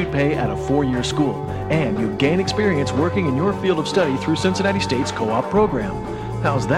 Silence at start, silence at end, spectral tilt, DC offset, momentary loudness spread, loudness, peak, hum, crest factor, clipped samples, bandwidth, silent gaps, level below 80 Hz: 0 s; 0 s; -6 dB/octave; under 0.1%; 4 LU; -20 LUFS; -6 dBFS; none; 14 dB; under 0.1%; 13 kHz; none; -40 dBFS